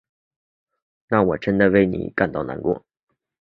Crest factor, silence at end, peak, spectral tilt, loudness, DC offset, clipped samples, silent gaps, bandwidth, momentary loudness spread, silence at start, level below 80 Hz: 20 dB; 0.65 s; -2 dBFS; -9.5 dB/octave; -21 LUFS; under 0.1%; under 0.1%; none; 5.8 kHz; 9 LU; 1.1 s; -48 dBFS